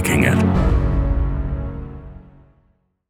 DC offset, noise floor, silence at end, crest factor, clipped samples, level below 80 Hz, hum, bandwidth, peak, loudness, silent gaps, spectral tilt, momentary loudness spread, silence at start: under 0.1%; -62 dBFS; 0.9 s; 18 dB; under 0.1%; -24 dBFS; none; 16.5 kHz; -2 dBFS; -19 LUFS; none; -6.5 dB/octave; 20 LU; 0 s